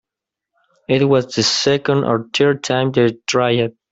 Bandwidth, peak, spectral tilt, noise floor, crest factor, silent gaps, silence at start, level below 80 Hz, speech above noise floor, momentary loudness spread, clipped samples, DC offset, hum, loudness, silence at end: 8 kHz; -2 dBFS; -4.5 dB/octave; -85 dBFS; 16 dB; none; 0.9 s; -56 dBFS; 69 dB; 3 LU; under 0.1%; under 0.1%; none; -16 LUFS; 0.2 s